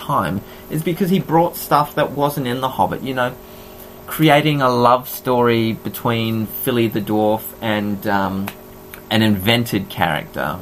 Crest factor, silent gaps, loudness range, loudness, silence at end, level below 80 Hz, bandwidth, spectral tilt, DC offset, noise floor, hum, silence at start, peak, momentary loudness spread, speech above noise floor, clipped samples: 18 dB; none; 3 LU; -18 LUFS; 0 s; -48 dBFS; 15.5 kHz; -5.5 dB/octave; under 0.1%; -37 dBFS; none; 0 s; 0 dBFS; 13 LU; 20 dB; under 0.1%